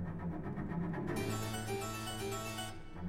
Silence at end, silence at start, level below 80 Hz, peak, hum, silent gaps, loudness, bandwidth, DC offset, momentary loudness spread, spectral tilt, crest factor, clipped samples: 0 s; 0 s; -52 dBFS; -26 dBFS; none; none; -40 LUFS; 16.5 kHz; under 0.1%; 4 LU; -5 dB/octave; 14 dB; under 0.1%